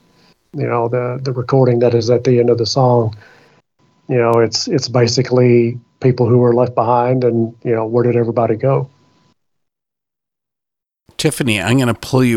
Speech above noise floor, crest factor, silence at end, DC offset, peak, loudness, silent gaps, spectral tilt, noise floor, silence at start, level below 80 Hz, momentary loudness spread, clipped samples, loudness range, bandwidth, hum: 72 dB; 14 dB; 0 s; under 0.1%; 0 dBFS; -15 LUFS; none; -6 dB/octave; -86 dBFS; 0.55 s; -52 dBFS; 7 LU; under 0.1%; 7 LU; 14.5 kHz; none